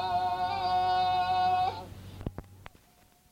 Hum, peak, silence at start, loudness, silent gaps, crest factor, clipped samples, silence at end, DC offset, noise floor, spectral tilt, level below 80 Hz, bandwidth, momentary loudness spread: none; -18 dBFS; 0 s; -28 LUFS; none; 12 dB; under 0.1%; 0.75 s; under 0.1%; -62 dBFS; -5 dB/octave; -54 dBFS; 15 kHz; 16 LU